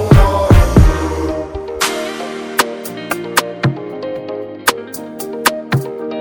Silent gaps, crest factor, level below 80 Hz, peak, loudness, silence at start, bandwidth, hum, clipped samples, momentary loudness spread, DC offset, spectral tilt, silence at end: none; 14 dB; -20 dBFS; 0 dBFS; -16 LUFS; 0 s; over 20 kHz; none; 0.5%; 14 LU; under 0.1%; -5 dB/octave; 0 s